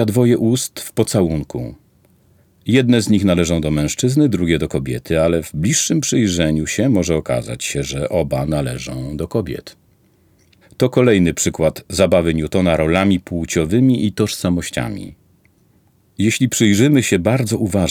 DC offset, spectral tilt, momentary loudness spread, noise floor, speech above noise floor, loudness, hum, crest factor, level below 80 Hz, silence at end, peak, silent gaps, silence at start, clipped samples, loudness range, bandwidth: under 0.1%; -5.5 dB/octave; 9 LU; -56 dBFS; 39 dB; -17 LUFS; none; 16 dB; -40 dBFS; 0 s; -2 dBFS; none; 0 s; under 0.1%; 4 LU; 18 kHz